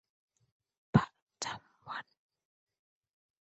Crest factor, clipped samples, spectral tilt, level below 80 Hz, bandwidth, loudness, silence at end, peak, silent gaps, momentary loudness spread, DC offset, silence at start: 30 dB; under 0.1%; -6 dB/octave; -62 dBFS; 8 kHz; -35 LUFS; 1.4 s; -10 dBFS; 1.22-1.27 s; 14 LU; under 0.1%; 0.95 s